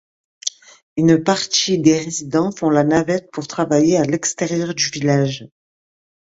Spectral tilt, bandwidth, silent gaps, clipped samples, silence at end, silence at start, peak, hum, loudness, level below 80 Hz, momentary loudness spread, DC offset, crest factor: -4.5 dB/octave; 8 kHz; 0.83-0.96 s; under 0.1%; 0.85 s; 0.45 s; 0 dBFS; none; -18 LUFS; -56 dBFS; 12 LU; under 0.1%; 18 dB